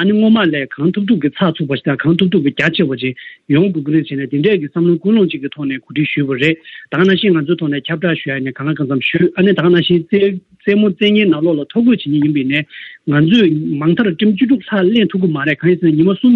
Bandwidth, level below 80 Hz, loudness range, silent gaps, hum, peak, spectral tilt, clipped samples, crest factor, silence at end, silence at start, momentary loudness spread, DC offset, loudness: 7 kHz; -58 dBFS; 3 LU; none; none; -2 dBFS; -8.5 dB/octave; under 0.1%; 12 dB; 0 s; 0 s; 8 LU; under 0.1%; -14 LUFS